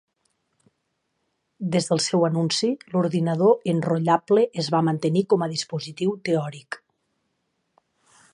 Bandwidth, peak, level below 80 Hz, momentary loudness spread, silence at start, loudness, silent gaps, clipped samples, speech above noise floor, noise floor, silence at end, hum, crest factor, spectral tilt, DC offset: 11 kHz; -4 dBFS; -70 dBFS; 10 LU; 1.6 s; -23 LUFS; none; under 0.1%; 53 dB; -75 dBFS; 1.6 s; none; 20 dB; -5.5 dB/octave; under 0.1%